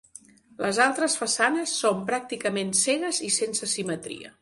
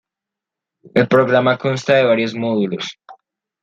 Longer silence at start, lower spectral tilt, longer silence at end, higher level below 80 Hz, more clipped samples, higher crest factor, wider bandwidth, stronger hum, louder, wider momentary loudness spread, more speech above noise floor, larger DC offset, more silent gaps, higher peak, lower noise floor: second, 0.6 s vs 0.85 s; second, -2 dB/octave vs -6 dB/octave; second, 0.1 s vs 0.5 s; second, -68 dBFS vs -62 dBFS; neither; about the same, 20 dB vs 16 dB; first, 12 kHz vs 7.8 kHz; neither; second, -25 LUFS vs -16 LUFS; about the same, 8 LU vs 9 LU; second, 25 dB vs 69 dB; neither; neither; second, -6 dBFS vs -2 dBFS; second, -51 dBFS vs -85 dBFS